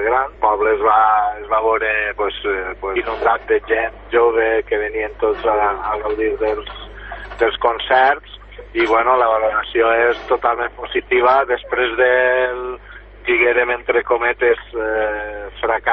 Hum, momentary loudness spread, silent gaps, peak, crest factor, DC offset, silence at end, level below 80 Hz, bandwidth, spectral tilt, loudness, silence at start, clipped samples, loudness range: 50 Hz at -40 dBFS; 10 LU; none; -2 dBFS; 16 dB; under 0.1%; 0 s; -40 dBFS; 6 kHz; -6 dB/octave; -17 LUFS; 0 s; under 0.1%; 3 LU